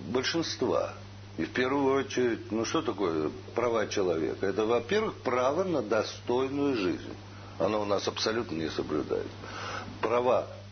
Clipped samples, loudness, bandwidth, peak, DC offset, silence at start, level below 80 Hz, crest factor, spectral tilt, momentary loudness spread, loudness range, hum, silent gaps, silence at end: under 0.1%; -30 LUFS; 6.6 kHz; -12 dBFS; under 0.1%; 0 s; -60 dBFS; 16 dB; -5 dB/octave; 10 LU; 2 LU; none; none; 0 s